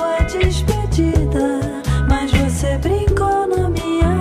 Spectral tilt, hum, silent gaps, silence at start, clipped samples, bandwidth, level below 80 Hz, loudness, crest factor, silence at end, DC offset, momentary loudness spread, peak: -6.5 dB/octave; none; none; 0 s; under 0.1%; 15 kHz; -22 dBFS; -18 LUFS; 12 dB; 0 s; under 0.1%; 3 LU; -4 dBFS